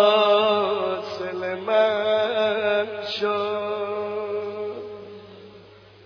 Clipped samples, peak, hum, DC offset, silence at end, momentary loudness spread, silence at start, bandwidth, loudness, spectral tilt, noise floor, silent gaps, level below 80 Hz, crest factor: under 0.1%; -6 dBFS; none; under 0.1%; 0.4 s; 14 LU; 0 s; 5.4 kHz; -23 LUFS; -5 dB/octave; -48 dBFS; none; -66 dBFS; 18 dB